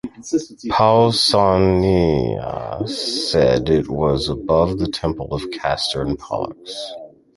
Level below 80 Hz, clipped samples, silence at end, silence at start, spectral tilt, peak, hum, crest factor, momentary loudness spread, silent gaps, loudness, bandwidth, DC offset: -36 dBFS; under 0.1%; 0.3 s; 0.05 s; -5.5 dB/octave; -2 dBFS; none; 18 dB; 12 LU; none; -18 LUFS; 11.5 kHz; under 0.1%